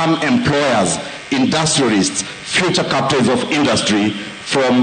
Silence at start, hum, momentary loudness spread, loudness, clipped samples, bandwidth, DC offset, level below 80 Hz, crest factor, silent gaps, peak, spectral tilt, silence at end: 0 s; none; 6 LU; -15 LUFS; under 0.1%; 9.8 kHz; under 0.1%; -48 dBFS; 12 dB; none; -4 dBFS; -4 dB/octave; 0 s